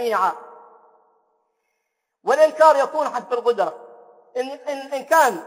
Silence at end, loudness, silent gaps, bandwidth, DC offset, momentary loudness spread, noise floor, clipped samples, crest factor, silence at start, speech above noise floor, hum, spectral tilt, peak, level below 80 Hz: 0 s; -20 LUFS; none; 16 kHz; under 0.1%; 15 LU; -77 dBFS; under 0.1%; 20 dB; 0 s; 57 dB; none; -2.5 dB/octave; -2 dBFS; -80 dBFS